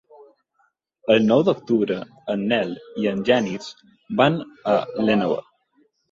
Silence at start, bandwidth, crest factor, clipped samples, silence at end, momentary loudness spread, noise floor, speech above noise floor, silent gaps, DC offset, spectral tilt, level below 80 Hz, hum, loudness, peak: 1.05 s; 7.6 kHz; 18 dB; under 0.1%; 0.7 s; 11 LU; -67 dBFS; 46 dB; none; under 0.1%; -6.5 dB/octave; -62 dBFS; none; -21 LUFS; -4 dBFS